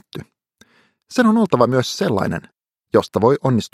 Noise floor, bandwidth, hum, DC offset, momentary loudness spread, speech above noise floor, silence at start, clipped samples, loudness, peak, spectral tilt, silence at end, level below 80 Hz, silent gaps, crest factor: -56 dBFS; 14.5 kHz; none; under 0.1%; 12 LU; 39 dB; 0.15 s; under 0.1%; -18 LUFS; 0 dBFS; -6 dB/octave; 0.05 s; -56 dBFS; none; 18 dB